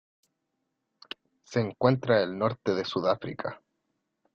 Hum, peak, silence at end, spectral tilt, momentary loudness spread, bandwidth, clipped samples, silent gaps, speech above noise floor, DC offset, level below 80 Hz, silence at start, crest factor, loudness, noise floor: none; -8 dBFS; 0.8 s; -7 dB/octave; 19 LU; 7.4 kHz; under 0.1%; none; 54 dB; under 0.1%; -68 dBFS; 1.5 s; 22 dB; -28 LUFS; -81 dBFS